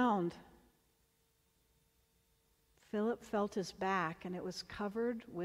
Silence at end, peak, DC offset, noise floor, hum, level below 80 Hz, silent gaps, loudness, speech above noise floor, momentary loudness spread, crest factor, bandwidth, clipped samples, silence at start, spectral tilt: 0 s; -22 dBFS; under 0.1%; -76 dBFS; none; -70 dBFS; none; -39 LUFS; 38 dB; 7 LU; 18 dB; 16 kHz; under 0.1%; 0 s; -6 dB/octave